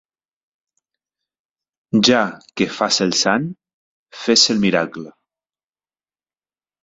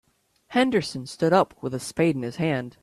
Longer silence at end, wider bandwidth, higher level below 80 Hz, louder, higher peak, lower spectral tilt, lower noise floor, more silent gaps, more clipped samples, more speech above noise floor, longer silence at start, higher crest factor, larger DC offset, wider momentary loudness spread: first, 1.75 s vs 0.1 s; second, 8 kHz vs 13.5 kHz; about the same, -60 dBFS vs -60 dBFS; first, -17 LUFS vs -24 LUFS; first, 0 dBFS vs -6 dBFS; second, -3 dB/octave vs -5.5 dB/octave; first, under -90 dBFS vs -55 dBFS; first, 3.74-4.06 s vs none; neither; first, over 73 dB vs 31 dB; first, 1.95 s vs 0.5 s; about the same, 20 dB vs 18 dB; neither; first, 13 LU vs 9 LU